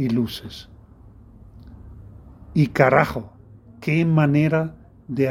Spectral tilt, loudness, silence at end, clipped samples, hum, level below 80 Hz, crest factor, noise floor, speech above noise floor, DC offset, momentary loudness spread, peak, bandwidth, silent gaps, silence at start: -8 dB/octave; -20 LUFS; 0 s; under 0.1%; none; -48 dBFS; 22 dB; -46 dBFS; 27 dB; under 0.1%; 18 LU; 0 dBFS; 15 kHz; none; 0 s